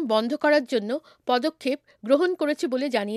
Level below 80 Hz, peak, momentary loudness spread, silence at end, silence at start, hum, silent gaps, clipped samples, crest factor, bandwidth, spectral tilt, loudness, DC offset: -78 dBFS; -8 dBFS; 9 LU; 0 s; 0 s; none; none; under 0.1%; 16 dB; 13.5 kHz; -4.5 dB/octave; -24 LUFS; under 0.1%